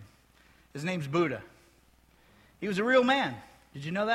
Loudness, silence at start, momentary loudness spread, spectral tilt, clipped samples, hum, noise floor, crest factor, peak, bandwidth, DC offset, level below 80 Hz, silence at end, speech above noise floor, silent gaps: -29 LUFS; 0 s; 21 LU; -5.5 dB/octave; under 0.1%; none; -63 dBFS; 20 dB; -12 dBFS; 13.5 kHz; under 0.1%; -66 dBFS; 0 s; 34 dB; none